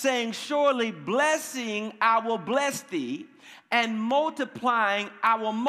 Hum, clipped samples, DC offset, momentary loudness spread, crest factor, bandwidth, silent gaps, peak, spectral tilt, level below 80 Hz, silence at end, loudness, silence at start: none; under 0.1%; under 0.1%; 8 LU; 18 dB; 15.5 kHz; none; -8 dBFS; -3 dB/octave; -82 dBFS; 0 s; -26 LUFS; 0 s